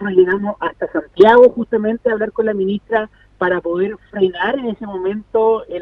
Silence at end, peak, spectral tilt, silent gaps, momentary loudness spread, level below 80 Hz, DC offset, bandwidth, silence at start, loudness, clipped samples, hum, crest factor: 0 s; 0 dBFS; -8 dB/octave; none; 13 LU; -50 dBFS; under 0.1%; 5.2 kHz; 0 s; -16 LUFS; under 0.1%; none; 16 dB